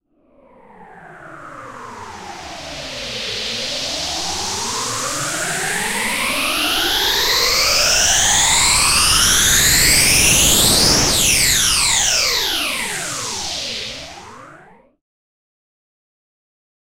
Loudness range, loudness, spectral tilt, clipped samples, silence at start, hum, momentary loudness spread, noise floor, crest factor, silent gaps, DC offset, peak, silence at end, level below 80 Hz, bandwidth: 17 LU; -14 LUFS; -0.5 dB/octave; under 0.1%; 0.8 s; none; 20 LU; -53 dBFS; 18 dB; none; under 0.1%; 0 dBFS; 2.4 s; -34 dBFS; 16 kHz